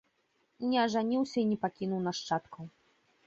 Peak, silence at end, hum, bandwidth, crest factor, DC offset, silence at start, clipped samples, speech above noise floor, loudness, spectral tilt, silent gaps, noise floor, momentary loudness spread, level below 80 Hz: -18 dBFS; 0.6 s; none; 8 kHz; 16 dB; under 0.1%; 0.6 s; under 0.1%; 43 dB; -32 LUFS; -5.5 dB/octave; none; -75 dBFS; 16 LU; -74 dBFS